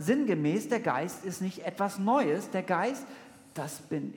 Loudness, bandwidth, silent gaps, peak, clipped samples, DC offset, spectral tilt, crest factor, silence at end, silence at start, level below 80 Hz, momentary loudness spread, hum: -31 LUFS; 18 kHz; none; -14 dBFS; under 0.1%; under 0.1%; -6 dB/octave; 18 dB; 0 s; 0 s; -80 dBFS; 13 LU; none